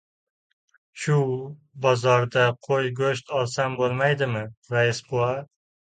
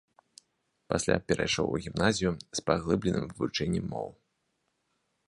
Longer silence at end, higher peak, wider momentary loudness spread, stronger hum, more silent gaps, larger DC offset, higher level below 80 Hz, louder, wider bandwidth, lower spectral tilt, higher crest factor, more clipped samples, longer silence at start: second, 0.55 s vs 1.15 s; about the same, -6 dBFS vs -8 dBFS; first, 9 LU vs 6 LU; neither; first, 4.57-4.62 s vs none; neither; second, -62 dBFS vs -52 dBFS; first, -24 LUFS vs -30 LUFS; second, 9.4 kHz vs 11.5 kHz; about the same, -5.5 dB/octave vs -4.5 dB/octave; second, 18 dB vs 24 dB; neither; about the same, 0.95 s vs 0.9 s